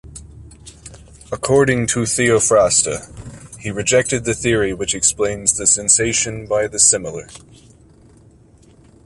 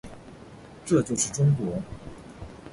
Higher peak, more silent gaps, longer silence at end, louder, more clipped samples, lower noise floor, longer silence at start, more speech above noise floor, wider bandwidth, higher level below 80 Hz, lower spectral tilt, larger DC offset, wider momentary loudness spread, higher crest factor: first, 0 dBFS vs -10 dBFS; neither; first, 1.7 s vs 0 s; first, -15 LUFS vs -25 LUFS; neither; about the same, -48 dBFS vs -46 dBFS; about the same, 0.05 s vs 0.05 s; first, 31 dB vs 22 dB; about the same, 11.5 kHz vs 11.5 kHz; first, -42 dBFS vs -52 dBFS; second, -3 dB/octave vs -6 dB/octave; neither; second, 17 LU vs 23 LU; about the same, 18 dB vs 18 dB